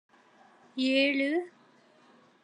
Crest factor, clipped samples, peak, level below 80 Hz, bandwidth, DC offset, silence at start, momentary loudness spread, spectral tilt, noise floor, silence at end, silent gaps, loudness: 18 dB; under 0.1%; -14 dBFS; under -90 dBFS; 9.8 kHz; under 0.1%; 0.75 s; 18 LU; -3 dB/octave; -61 dBFS; 0.95 s; none; -28 LUFS